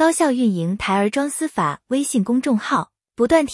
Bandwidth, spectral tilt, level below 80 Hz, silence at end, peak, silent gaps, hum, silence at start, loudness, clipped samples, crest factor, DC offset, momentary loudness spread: 12 kHz; -5 dB/octave; -52 dBFS; 0 s; -2 dBFS; none; none; 0 s; -20 LUFS; under 0.1%; 16 dB; under 0.1%; 6 LU